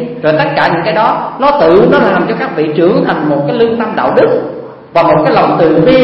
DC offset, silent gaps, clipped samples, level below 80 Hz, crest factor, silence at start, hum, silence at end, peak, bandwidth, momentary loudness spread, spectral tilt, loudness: under 0.1%; none; 0.2%; -42 dBFS; 10 dB; 0 s; none; 0 s; 0 dBFS; 5.8 kHz; 7 LU; -8.5 dB/octave; -10 LUFS